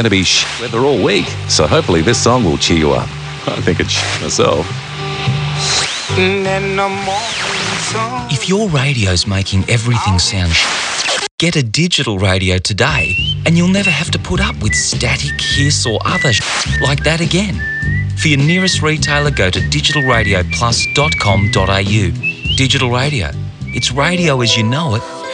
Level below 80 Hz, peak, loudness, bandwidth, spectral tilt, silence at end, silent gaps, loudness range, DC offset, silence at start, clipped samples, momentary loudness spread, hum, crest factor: -30 dBFS; 0 dBFS; -13 LUFS; 10.5 kHz; -4 dB/octave; 0 s; 11.31-11.38 s; 3 LU; under 0.1%; 0 s; under 0.1%; 6 LU; none; 14 dB